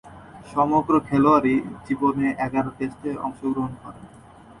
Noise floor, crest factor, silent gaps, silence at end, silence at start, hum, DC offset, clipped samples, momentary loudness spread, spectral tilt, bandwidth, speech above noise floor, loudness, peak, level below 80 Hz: -43 dBFS; 18 dB; none; 0.05 s; 0.05 s; none; under 0.1%; under 0.1%; 13 LU; -8 dB/octave; 11 kHz; 21 dB; -23 LUFS; -6 dBFS; -52 dBFS